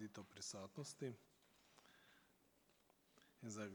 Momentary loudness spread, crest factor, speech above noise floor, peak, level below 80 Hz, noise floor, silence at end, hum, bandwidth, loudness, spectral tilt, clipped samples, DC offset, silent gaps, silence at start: 17 LU; 20 dB; 25 dB; -36 dBFS; under -90 dBFS; -77 dBFS; 0 s; none; over 20 kHz; -53 LUFS; -4 dB/octave; under 0.1%; under 0.1%; none; 0 s